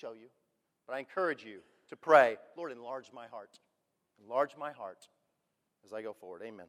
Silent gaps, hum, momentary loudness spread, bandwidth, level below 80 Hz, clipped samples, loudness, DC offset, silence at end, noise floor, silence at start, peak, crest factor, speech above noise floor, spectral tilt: none; none; 24 LU; 12.5 kHz; -90 dBFS; under 0.1%; -32 LUFS; under 0.1%; 0.05 s; -83 dBFS; 0.05 s; -8 dBFS; 26 dB; 48 dB; -4.5 dB/octave